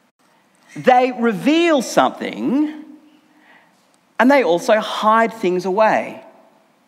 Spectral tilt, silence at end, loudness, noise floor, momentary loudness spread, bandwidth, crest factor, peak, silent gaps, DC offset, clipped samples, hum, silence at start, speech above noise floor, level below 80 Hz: -4.5 dB/octave; 0.65 s; -16 LUFS; -57 dBFS; 10 LU; 15.5 kHz; 18 dB; 0 dBFS; none; under 0.1%; under 0.1%; none; 0.75 s; 41 dB; -78 dBFS